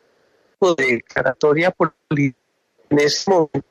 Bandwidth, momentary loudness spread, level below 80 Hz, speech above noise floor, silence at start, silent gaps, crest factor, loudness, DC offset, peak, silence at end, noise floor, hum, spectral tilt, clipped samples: 13.5 kHz; 5 LU; -56 dBFS; 44 dB; 0.6 s; none; 16 dB; -18 LUFS; under 0.1%; -4 dBFS; 0.1 s; -61 dBFS; none; -5 dB/octave; under 0.1%